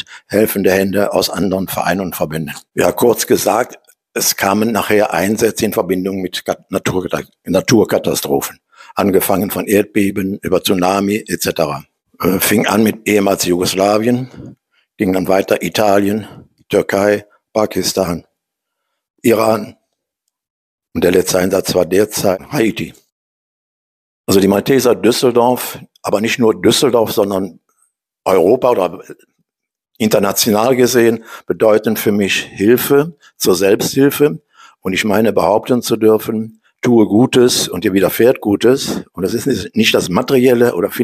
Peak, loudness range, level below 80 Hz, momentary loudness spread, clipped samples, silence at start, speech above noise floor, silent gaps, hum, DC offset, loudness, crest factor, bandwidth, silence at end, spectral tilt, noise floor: 0 dBFS; 4 LU; -50 dBFS; 9 LU; under 0.1%; 0.1 s; 68 dB; 19.10-19.14 s, 20.50-20.78 s, 23.12-24.24 s; none; under 0.1%; -14 LUFS; 14 dB; 15.5 kHz; 0 s; -4.5 dB/octave; -82 dBFS